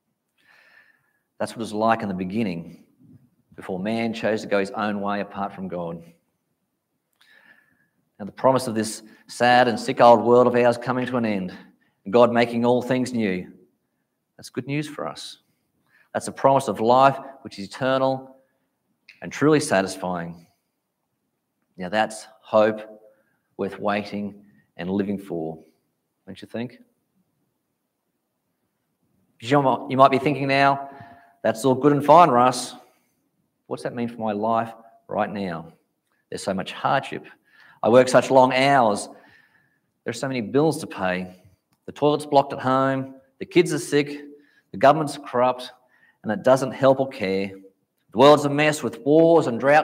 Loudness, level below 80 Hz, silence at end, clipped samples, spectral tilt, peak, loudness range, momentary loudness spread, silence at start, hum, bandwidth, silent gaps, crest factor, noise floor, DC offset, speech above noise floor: -21 LUFS; -70 dBFS; 0 s; under 0.1%; -5.5 dB/octave; 0 dBFS; 11 LU; 19 LU; 1.4 s; none; 16 kHz; none; 22 dB; -77 dBFS; under 0.1%; 56 dB